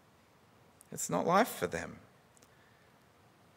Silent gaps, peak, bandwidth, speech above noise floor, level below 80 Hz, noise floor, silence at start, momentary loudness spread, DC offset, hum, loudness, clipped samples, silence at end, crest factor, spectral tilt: none; -12 dBFS; 16 kHz; 32 dB; -70 dBFS; -64 dBFS; 0.9 s; 18 LU; under 0.1%; none; -33 LUFS; under 0.1%; 1.6 s; 24 dB; -4 dB/octave